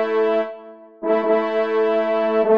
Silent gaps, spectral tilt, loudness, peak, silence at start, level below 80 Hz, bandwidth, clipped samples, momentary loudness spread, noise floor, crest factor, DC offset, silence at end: none; -7 dB/octave; -20 LUFS; -6 dBFS; 0 s; -72 dBFS; 5.6 kHz; under 0.1%; 10 LU; -40 dBFS; 14 dB; 0.2%; 0 s